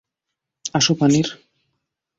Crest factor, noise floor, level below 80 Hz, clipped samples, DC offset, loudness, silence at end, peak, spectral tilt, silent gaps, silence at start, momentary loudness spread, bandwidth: 18 dB; -82 dBFS; -58 dBFS; under 0.1%; under 0.1%; -18 LUFS; 0.85 s; -4 dBFS; -4 dB/octave; none; 0.65 s; 12 LU; 8 kHz